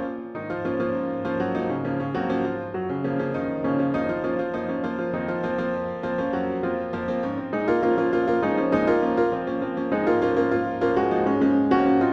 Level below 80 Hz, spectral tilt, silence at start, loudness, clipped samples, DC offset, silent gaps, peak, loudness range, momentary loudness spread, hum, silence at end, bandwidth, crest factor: -54 dBFS; -8.5 dB/octave; 0 s; -24 LUFS; under 0.1%; under 0.1%; none; -8 dBFS; 4 LU; 7 LU; none; 0 s; 6.6 kHz; 16 dB